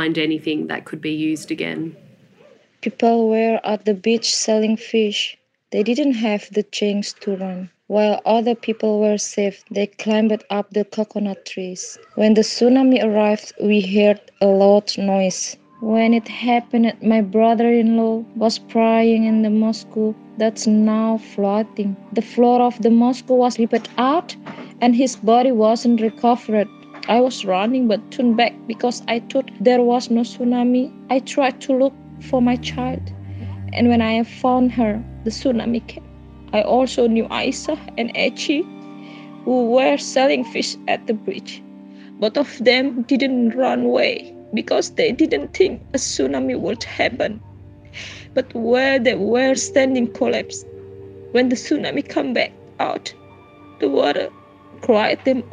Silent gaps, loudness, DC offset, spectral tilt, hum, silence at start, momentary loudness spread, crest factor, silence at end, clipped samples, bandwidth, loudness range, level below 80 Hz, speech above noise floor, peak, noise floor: none; -19 LUFS; under 0.1%; -4.5 dB/octave; none; 0 s; 12 LU; 18 dB; 0.05 s; under 0.1%; 9.8 kHz; 4 LU; -52 dBFS; 33 dB; -2 dBFS; -51 dBFS